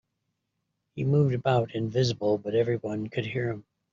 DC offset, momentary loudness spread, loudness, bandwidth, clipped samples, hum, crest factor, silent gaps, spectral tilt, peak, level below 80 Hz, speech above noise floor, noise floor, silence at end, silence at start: under 0.1%; 9 LU; -27 LUFS; 7.6 kHz; under 0.1%; none; 18 dB; none; -6.5 dB/octave; -10 dBFS; -62 dBFS; 54 dB; -80 dBFS; 0.3 s; 0.95 s